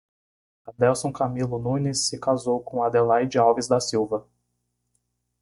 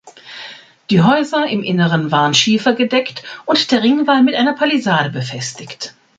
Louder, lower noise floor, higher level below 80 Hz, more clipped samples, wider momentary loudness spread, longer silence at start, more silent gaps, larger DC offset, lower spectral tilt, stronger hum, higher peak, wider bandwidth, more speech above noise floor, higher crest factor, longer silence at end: second, -23 LUFS vs -14 LUFS; first, -76 dBFS vs -36 dBFS; about the same, -60 dBFS vs -58 dBFS; neither; second, 6 LU vs 17 LU; first, 0.65 s vs 0.05 s; neither; neither; about the same, -5 dB/octave vs -4.5 dB/octave; first, 60 Hz at -45 dBFS vs none; second, -6 dBFS vs 0 dBFS; first, 11.5 kHz vs 9.2 kHz; first, 53 dB vs 21 dB; about the same, 18 dB vs 16 dB; first, 1.2 s vs 0.3 s